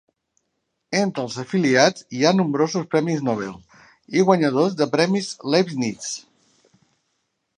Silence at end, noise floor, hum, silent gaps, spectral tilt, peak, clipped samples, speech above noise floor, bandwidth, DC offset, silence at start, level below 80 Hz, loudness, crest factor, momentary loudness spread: 1.35 s; -75 dBFS; none; none; -5 dB/octave; -2 dBFS; under 0.1%; 55 dB; 10.5 kHz; under 0.1%; 0.9 s; -66 dBFS; -21 LUFS; 20 dB; 10 LU